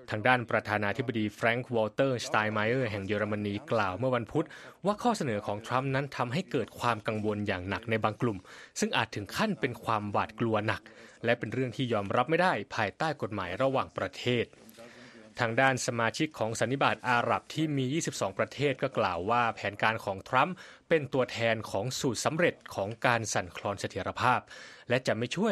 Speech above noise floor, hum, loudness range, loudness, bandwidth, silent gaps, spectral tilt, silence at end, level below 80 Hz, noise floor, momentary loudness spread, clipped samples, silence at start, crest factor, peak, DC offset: 21 dB; none; 2 LU; -30 LUFS; 13.5 kHz; none; -5 dB/octave; 0 s; -66 dBFS; -52 dBFS; 7 LU; under 0.1%; 0 s; 22 dB; -8 dBFS; under 0.1%